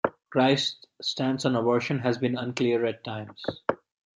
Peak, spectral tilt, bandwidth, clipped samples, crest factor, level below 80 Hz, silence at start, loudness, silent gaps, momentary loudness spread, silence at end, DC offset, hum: -8 dBFS; -5.5 dB/octave; 11 kHz; under 0.1%; 20 dB; -68 dBFS; 0.05 s; -27 LUFS; none; 12 LU; 0.4 s; under 0.1%; none